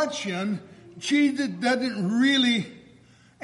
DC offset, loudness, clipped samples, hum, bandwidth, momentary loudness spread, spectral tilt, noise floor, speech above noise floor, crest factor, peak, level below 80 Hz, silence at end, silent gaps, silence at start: under 0.1%; -24 LUFS; under 0.1%; none; 11.5 kHz; 12 LU; -4 dB/octave; -55 dBFS; 31 dB; 14 dB; -10 dBFS; -70 dBFS; 0.65 s; none; 0 s